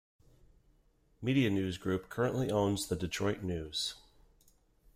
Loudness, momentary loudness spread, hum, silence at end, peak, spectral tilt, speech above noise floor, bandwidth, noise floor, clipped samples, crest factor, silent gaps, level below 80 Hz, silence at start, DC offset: -34 LUFS; 7 LU; none; 1 s; -16 dBFS; -5.5 dB/octave; 36 dB; 16 kHz; -69 dBFS; under 0.1%; 18 dB; none; -60 dBFS; 1.2 s; under 0.1%